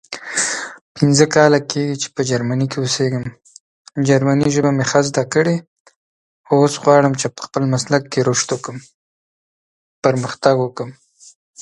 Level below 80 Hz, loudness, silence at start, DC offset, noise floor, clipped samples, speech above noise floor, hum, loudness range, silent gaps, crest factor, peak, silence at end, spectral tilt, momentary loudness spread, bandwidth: -56 dBFS; -17 LUFS; 0.1 s; under 0.1%; under -90 dBFS; under 0.1%; over 74 dB; none; 4 LU; 0.81-0.95 s, 3.60-3.85 s, 5.67-5.85 s, 5.96-6.44 s, 8.94-10.02 s, 11.35-11.54 s; 18 dB; 0 dBFS; 0 s; -5 dB/octave; 12 LU; 11.5 kHz